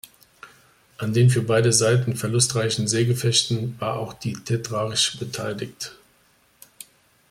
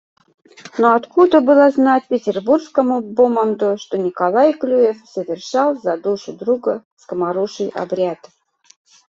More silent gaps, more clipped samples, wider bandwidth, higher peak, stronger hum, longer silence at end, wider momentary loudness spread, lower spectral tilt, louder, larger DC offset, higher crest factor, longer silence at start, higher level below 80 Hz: second, none vs 6.85-6.97 s; neither; first, 16 kHz vs 7.6 kHz; about the same, -4 dBFS vs -2 dBFS; neither; first, 1.4 s vs 1 s; about the same, 13 LU vs 11 LU; second, -4 dB/octave vs -6 dB/octave; second, -22 LUFS vs -17 LUFS; neither; about the same, 20 dB vs 16 dB; second, 0.45 s vs 0.65 s; first, -58 dBFS vs -64 dBFS